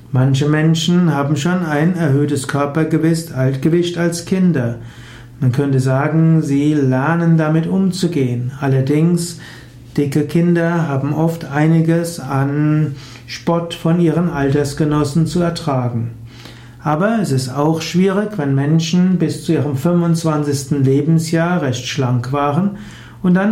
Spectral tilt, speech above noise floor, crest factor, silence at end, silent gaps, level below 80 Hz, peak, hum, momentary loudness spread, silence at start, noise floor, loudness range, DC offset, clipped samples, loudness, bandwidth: -7 dB/octave; 21 dB; 12 dB; 0 s; none; -46 dBFS; -4 dBFS; none; 7 LU; 0 s; -36 dBFS; 2 LU; under 0.1%; under 0.1%; -16 LUFS; 14.5 kHz